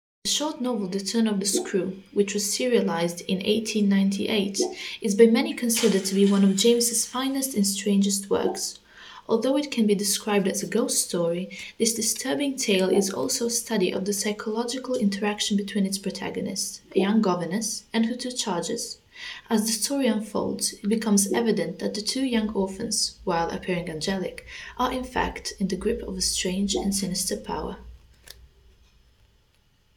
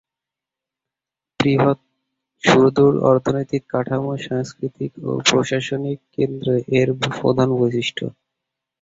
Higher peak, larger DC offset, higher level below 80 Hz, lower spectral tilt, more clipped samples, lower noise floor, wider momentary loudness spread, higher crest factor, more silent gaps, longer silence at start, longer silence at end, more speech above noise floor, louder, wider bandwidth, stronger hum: second, -4 dBFS vs 0 dBFS; neither; about the same, -52 dBFS vs -54 dBFS; second, -4 dB/octave vs -5.5 dB/octave; neither; second, -63 dBFS vs -88 dBFS; second, 8 LU vs 13 LU; about the same, 22 dB vs 20 dB; neither; second, 0.25 s vs 1.4 s; first, 1.7 s vs 0.7 s; second, 38 dB vs 69 dB; second, -25 LUFS vs -19 LUFS; first, 19 kHz vs 7.8 kHz; neither